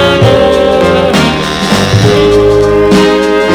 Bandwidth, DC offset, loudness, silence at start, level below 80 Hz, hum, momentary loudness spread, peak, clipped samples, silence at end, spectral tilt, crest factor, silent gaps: 16.5 kHz; under 0.1%; -7 LUFS; 0 s; -26 dBFS; none; 3 LU; 0 dBFS; 2%; 0 s; -5.5 dB/octave; 6 dB; none